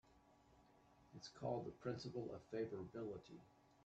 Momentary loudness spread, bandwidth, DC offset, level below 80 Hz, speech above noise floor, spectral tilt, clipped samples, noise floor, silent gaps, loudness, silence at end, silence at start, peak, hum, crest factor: 14 LU; 8.4 kHz; under 0.1%; -78 dBFS; 23 dB; -6.5 dB/octave; under 0.1%; -72 dBFS; none; -50 LUFS; 0.05 s; 0.05 s; -32 dBFS; none; 18 dB